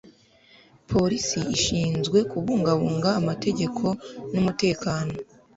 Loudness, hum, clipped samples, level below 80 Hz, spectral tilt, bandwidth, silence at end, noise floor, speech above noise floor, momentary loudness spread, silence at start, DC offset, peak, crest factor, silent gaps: -24 LUFS; none; under 0.1%; -50 dBFS; -5 dB/octave; 8 kHz; 0.35 s; -56 dBFS; 32 dB; 6 LU; 0.9 s; under 0.1%; -8 dBFS; 18 dB; none